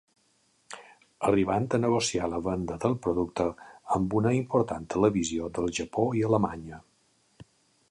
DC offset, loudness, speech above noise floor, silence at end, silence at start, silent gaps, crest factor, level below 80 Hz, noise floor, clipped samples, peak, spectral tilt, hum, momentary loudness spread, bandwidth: under 0.1%; -28 LUFS; 41 dB; 0.45 s; 0.7 s; none; 18 dB; -52 dBFS; -68 dBFS; under 0.1%; -10 dBFS; -6 dB/octave; none; 19 LU; 11.5 kHz